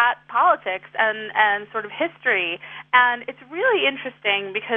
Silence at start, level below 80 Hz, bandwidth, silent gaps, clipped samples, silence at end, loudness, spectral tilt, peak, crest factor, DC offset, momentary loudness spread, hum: 0 s; -76 dBFS; 3.9 kHz; none; under 0.1%; 0 s; -21 LUFS; -6 dB/octave; -2 dBFS; 20 dB; under 0.1%; 10 LU; none